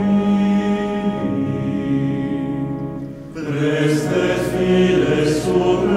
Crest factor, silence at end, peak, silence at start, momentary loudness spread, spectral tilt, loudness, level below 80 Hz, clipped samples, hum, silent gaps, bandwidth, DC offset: 14 dB; 0 s; -4 dBFS; 0 s; 10 LU; -7 dB/octave; -19 LUFS; -42 dBFS; under 0.1%; none; none; 14 kHz; under 0.1%